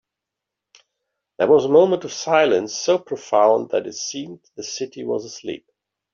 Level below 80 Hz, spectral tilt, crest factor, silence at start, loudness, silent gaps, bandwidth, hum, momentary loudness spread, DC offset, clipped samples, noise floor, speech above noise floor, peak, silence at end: -66 dBFS; -4 dB/octave; 18 dB; 1.4 s; -19 LUFS; none; 7.4 kHz; none; 17 LU; under 0.1%; under 0.1%; -84 dBFS; 65 dB; -2 dBFS; 0.55 s